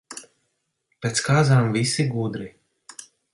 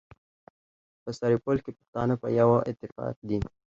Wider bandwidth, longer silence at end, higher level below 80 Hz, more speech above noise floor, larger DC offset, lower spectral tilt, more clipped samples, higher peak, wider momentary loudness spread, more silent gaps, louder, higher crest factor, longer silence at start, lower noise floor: first, 11.5 kHz vs 7.6 kHz; about the same, 0.3 s vs 0.3 s; second, -58 dBFS vs -52 dBFS; second, 54 dB vs over 63 dB; neither; second, -5 dB/octave vs -8.5 dB/octave; neither; about the same, -6 dBFS vs -8 dBFS; first, 24 LU vs 14 LU; second, none vs 1.88-1.93 s, 3.16-3.22 s; first, -21 LUFS vs -28 LUFS; about the same, 18 dB vs 20 dB; second, 0.1 s vs 1.05 s; second, -74 dBFS vs under -90 dBFS